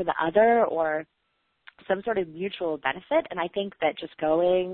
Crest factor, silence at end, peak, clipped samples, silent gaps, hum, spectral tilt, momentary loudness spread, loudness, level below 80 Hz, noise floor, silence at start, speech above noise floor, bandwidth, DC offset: 18 dB; 0 s; -8 dBFS; under 0.1%; none; none; -9.5 dB/octave; 10 LU; -26 LUFS; -62 dBFS; -57 dBFS; 0 s; 31 dB; 4.3 kHz; under 0.1%